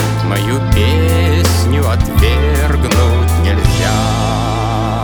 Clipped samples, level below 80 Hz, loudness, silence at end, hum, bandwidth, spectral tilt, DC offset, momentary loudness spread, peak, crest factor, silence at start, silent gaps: under 0.1%; -18 dBFS; -13 LUFS; 0 s; none; over 20 kHz; -5.5 dB/octave; under 0.1%; 3 LU; 0 dBFS; 12 dB; 0 s; none